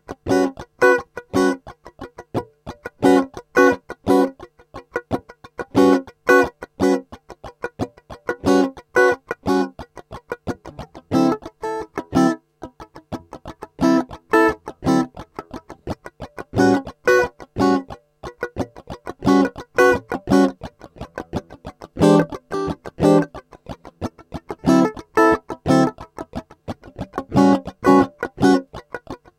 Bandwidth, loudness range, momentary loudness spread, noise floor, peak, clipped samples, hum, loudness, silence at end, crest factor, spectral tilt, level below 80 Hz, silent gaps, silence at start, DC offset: 15.5 kHz; 3 LU; 21 LU; -42 dBFS; 0 dBFS; under 0.1%; none; -19 LUFS; 0.25 s; 20 dB; -6 dB/octave; -48 dBFS; none; 0.1 s; under 0.1%